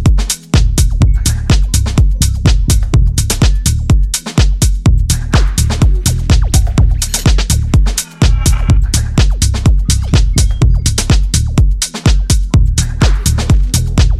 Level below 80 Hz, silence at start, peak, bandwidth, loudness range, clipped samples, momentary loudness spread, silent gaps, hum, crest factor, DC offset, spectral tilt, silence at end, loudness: -12 dBFS; 0 s; 0 dBFS; 14.5 kHz; 0 LU; under 0.1%; 2 LU; none; none; 10 dB; under 0.1%; -4.5 dB/octave; 0 s; -12 LUFS